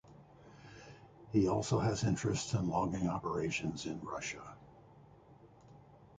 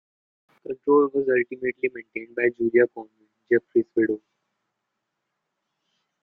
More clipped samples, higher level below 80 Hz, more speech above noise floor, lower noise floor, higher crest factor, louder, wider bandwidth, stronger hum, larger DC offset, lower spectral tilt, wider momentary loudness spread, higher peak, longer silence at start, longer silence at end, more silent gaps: neither; first, -58 dBFS vs -70 dBFS; second, 25 dB vs 57 dB; second, -60 dBFS vs -80 dBFS; about the same, 20 dB vs 18 dB; second, -35 LUFS vs -24 LUFS; first, 9.4 kHz vs 3 kHz; neither; neither; second, -5.5 dB/octave vs -10 dB/octave; first, 23 LU vs 14 LU; second, -18 dBFS vs -6 dBFS; second, 0.05 s vs 0.7 s; second, 0.1 s vs 2.05 s; neither